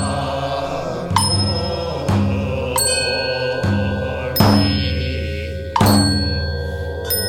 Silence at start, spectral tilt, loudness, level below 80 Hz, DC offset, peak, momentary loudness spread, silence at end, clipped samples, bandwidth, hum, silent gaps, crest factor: 0 s; -4.5 dB/octave; -18 LUFS; -34 dBFS; under 0.1%; 0 dBFS; 10 LU; 0 s; under 0.1%; 17.5 kHz; none; none; 18 dB